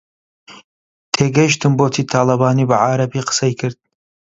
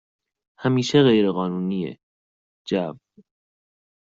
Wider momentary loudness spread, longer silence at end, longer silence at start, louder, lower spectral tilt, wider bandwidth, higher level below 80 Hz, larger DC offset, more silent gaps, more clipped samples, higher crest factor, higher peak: second, 6 LU vs 15 LU; second, 0.6 s vs 1.15 s; about the same, 0.5 s vs 0.6 s; first, -16 LUFS vs -22 LUFS; about the same, -5 dB/octave vs -5.5 dB/octave; about the same, 7.8 kHz vs 7.6 kHz; first, -54 dBFS vs -64 dBFS; neither; second, 0.64-1.12 s vs 2.03-2.65 s; neither; about the same, 16 dB vs 18 dB; first, 0 dBFS vs -6 dBFS